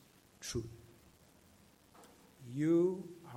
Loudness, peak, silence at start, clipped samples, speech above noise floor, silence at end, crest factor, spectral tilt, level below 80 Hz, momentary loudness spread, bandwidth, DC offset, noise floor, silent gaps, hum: -36 LUFS; -22 dBFS; 0.4 s; under 0.1%; 30 dB; 0 s; 18 dB; -6.5 dB/octave; -66 dBFS; 24 LU; 15.5 kHz; under 0.1%; -65 dBFS; none; none